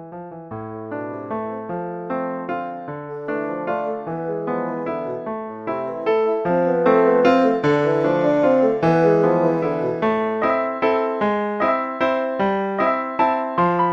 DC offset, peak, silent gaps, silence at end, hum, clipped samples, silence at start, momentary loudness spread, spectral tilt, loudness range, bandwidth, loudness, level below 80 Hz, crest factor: under 0.1%; -4 dBFS; none; 0 s; none; under 0.1%; 0 s; 13 LU; -8 dB/octave; 10 LU; 7.2 kHz; -20 LUFS; -58 dBFS; 16 dB